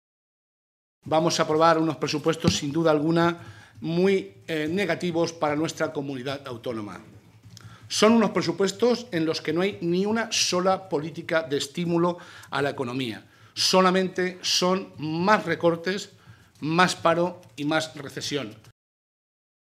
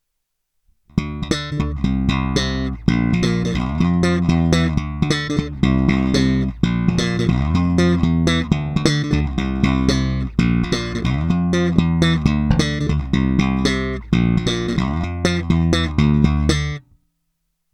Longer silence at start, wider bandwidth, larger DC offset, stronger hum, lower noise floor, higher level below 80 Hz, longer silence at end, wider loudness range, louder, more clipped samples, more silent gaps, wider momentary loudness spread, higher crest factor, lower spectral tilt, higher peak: about the same, 1.05 s vs 0.95 s; first, 15 kHz vs 11 kHz; neither; neither; second, -49 dBFS vs -74 dBFS; second, -64 dBFS vs -28 dBFS; first, 1.15 s vs 0.95 s; about the same, 3 LU vs 2 LU; second, -24 LUFS vs -19 LUFS; neither; neither; first, 13 LU vs 5 LU; first, 24 dB vs 18 dB; second, -4.5 dB/octave vs -6 dB/octave; about the same, -2 dBFS vs 0 dBFS